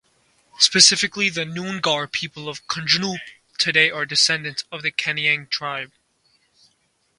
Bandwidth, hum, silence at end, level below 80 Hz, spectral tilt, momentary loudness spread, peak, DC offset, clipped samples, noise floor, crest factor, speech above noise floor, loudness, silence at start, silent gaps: 11.5 kHz; none; 1.35 s; -66 dBFS; -1 dB/octave; 17 LU; 0 dBFS; under 0.1%; under 0.1%; -66 dBFS; 22 dB; 45 dB; -19 LUFS; 0.6 s; none